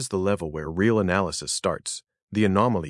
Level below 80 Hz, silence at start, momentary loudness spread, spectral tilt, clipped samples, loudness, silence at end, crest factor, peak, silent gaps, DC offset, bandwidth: -54 dBFS; 0 s; 10 LU; -5 dB/octave; under 0.1%; -25 LUFS; 0 s; 18 dB; -6 dBFS; 2.23-2.28 s; under 0.1%; 12 kHz